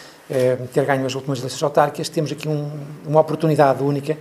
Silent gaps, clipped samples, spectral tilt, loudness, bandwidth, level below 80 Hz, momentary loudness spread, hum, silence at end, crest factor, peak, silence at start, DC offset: none; under 0.1%; -6 dB/octave; -20 LUFS; 14 kHz; -66 dBFS; 9 LU; none; 0 s; 20 dB; 0 dBFS; 0 s; under 0.1%